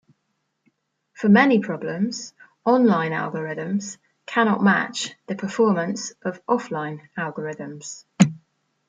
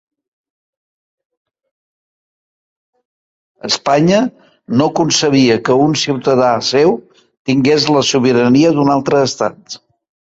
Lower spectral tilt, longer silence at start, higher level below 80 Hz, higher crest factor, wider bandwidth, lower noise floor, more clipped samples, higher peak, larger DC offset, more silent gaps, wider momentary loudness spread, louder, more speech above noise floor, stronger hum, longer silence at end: about the same, -5.5 dB/octave vs -4.5 dB/octave; second, 1.2 s vs 3.65 s; second, -70 dBFS vs -54 dBFS; first, 22 dB vs 14 dB; first, 9.2 kHz vs 8 kHz; second, -74 dBFS vs under -90 dBFS; neither; about the same, -2 dBFS vs 0 dBFS; neither; second, none vs 7.39-7.45 s; first, 16 LU vs 11 LU; second, -22 LUFS vs -13 LUFS; second, 53 dB vs over 78 dB; neither; about the same, 0.5 s vs 0.6 s